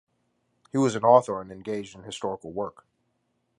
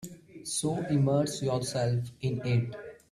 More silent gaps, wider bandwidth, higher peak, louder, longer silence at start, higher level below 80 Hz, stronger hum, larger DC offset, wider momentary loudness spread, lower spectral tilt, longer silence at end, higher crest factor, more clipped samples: neither; second, 11 kHz vs 13.5 kHz; first, -4 dBFS vs -14 dBFS; first, -26 LUFS vs -30 LUFS; first, 0.75 s vs 0 s; about the same, -66 dBFS vs -62 dBFS; neither; neither; about the same, 15 LU vs 13 LU; about the same, -6 dB/octave vs -6 dB/octave; first, 0.9 s vs 0.15 s; first, 24 dB vs 16 dB; neither